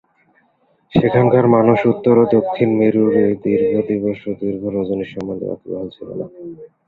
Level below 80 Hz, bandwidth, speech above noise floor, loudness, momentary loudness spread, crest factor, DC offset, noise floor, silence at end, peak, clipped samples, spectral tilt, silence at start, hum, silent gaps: -50 dBFS; 4.7 kHz; 44 dB; -16 LUFS; 16 LU; 16 dB; under 0.1%; -60 dBFS; 0.2 s; -2 dBFS; under 0.1%; -10 dB/octave; 0.95 s; none; none